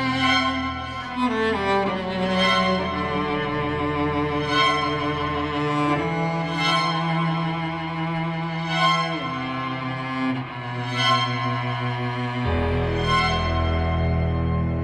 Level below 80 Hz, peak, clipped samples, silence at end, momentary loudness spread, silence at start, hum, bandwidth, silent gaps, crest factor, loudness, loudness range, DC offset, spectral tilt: -38 dBFS; -8 dBFS; under 0.1%; 0 s; 8 LU; 0 s; none; 11 kHz; none; 16 dB; -23 LUFS; 3 LU; under 0.1%; -5.5 dB/octave